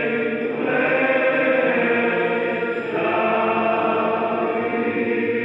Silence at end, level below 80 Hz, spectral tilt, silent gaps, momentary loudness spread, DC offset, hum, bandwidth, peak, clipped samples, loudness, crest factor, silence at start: 0 s; -68 dBFS; -7.5 dB/octave; none; 5 LU; under 0.1%; none; 5.4 kHz; -6 dBFS; under 0.1%; -20 LUFS; 14 dB; 0 s